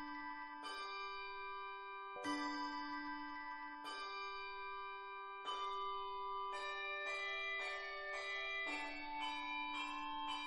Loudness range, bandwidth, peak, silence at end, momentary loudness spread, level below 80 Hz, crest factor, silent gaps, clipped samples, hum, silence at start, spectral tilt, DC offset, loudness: 4 LU; 10 kHz; -30 dBFS; 0 s; 7 LU; -74 dBFS; 16 dB; none; under 0.1%; none; 0 s; -1.5 dB/octave; under 0.1%; -45 LUFS